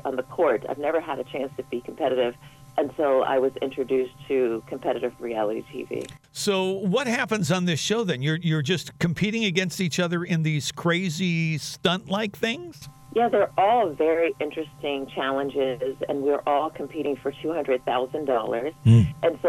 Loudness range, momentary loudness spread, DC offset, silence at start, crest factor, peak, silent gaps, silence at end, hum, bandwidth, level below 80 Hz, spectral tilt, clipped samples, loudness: 3 LU; 9 LU; under 0.1%; 0.05 s; 18 dB; -6 dBFS; none; 0 s; none; 16.5 kHz; -58 dBFS; -5.5 dB/octave; under 0.1%; -25 LUFS